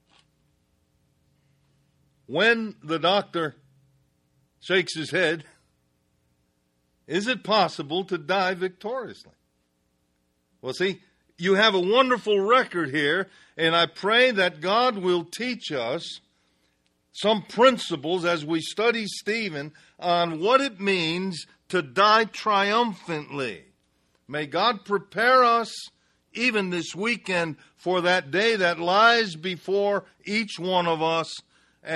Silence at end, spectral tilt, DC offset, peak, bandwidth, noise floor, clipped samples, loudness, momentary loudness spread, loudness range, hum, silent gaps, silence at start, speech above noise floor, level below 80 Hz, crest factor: 0 s; -4 dB/octave; under 0.1%; -6 dBFS; 12.5 kHz; -71 dBFS; under 0.1%; -23 LUFS; 14 LU; 6 LU; none; none; 2.3 s; 47 dB; -72 dBFS; 20 dB